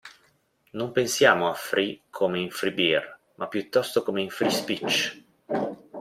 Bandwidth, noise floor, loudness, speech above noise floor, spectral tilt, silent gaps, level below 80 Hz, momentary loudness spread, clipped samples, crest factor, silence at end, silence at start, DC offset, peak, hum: 16 kHz; -65 dBFS; -25 LUFS; 40 dB; -3.5 dB/octave; none; -68 dBFS; 12 LU; under 0.1%; 22 dB; 0 s; 0.05 s; under 0.1%; -4 dBFS; none